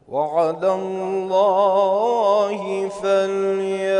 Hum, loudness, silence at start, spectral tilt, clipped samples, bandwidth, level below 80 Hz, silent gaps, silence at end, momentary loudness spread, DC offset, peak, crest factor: none; -20 LUFS; 0.1 s; -5.5 dB/octave; under 0.1%; 10.5 kHz; -66 dBFS; none; 0 s; 7 LU; under 0.1%; -6 dBFS; 12 dB